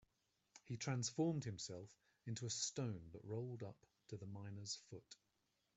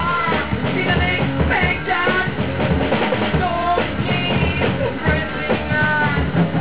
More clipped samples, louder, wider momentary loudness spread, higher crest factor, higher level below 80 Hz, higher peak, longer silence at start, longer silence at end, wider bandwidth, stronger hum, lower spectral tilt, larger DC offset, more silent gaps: neither; second, -47 LUFS vs -18 LUFS; first, 21 LU vs 3 LU; first, 20 dB vs 14 dB; second, -80 dBFS vs -30 dBFS; second, -30 dBFS vs -4 dBFS; first, 0.55 s vs 0 s; first, 0.65 s vs 0 s; first, 8.2 kHz vs 4 kHz; neither; second, -4.5 dB/octave vs -10 dB/octave; second, under 0.1% vs 2%; neither